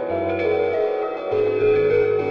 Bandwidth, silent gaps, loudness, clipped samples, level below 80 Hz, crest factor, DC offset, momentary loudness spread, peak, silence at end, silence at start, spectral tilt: 5.6 kHz; none; -20 LUFS; under 0.1%; -56 dBFS; 10 dB; under 0.1%; 6 LU; -10 dBFS; 0 s; 0 s; -8 dB/octave